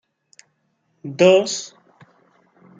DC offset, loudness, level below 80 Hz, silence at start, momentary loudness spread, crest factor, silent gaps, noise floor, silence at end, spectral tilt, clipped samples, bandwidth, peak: under 0.1%; -17 LUFS; -72 dBFS; 1.05 s; 24 LU; 20 dB; none; -68 dBFS; 1.1 s; -4 dB/octave; under 0.1%; 9.4 kHz; -2 dBFS